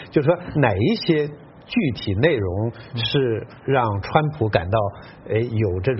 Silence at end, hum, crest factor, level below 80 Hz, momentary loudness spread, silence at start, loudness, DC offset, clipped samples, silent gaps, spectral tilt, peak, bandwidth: 0 s; none; 20 dB; -46 dBFS; 7 LU; 0 s; -22 LUFS; under 0.1%; under 0.1%; none; -5.5 dB/octave; 0 dBFS; 6 kHz